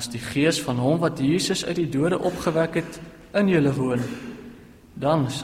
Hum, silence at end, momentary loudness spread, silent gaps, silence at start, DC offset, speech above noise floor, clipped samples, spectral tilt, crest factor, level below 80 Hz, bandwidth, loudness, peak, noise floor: none; 0 s; 12 LU; none; 0 s; under 0.1%; 23 dB; under 0.1%; -5.5 dB/octave; 16 dB; -52 dBFS; 16 kHz; -23 LUFS; -8 dBFS; -45 dBFS